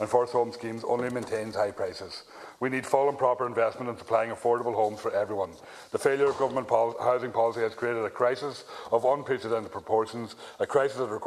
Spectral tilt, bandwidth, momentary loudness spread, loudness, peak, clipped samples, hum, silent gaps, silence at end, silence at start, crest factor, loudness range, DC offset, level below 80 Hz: -5.5 dB/octave; 13.5 kHz; 11 LU; -28 LUFS; -8 dBFS; under 0.1%; none; none; 0 s; 0 s; 20 dB; 2 LU; under 0.1%; -70 dBFS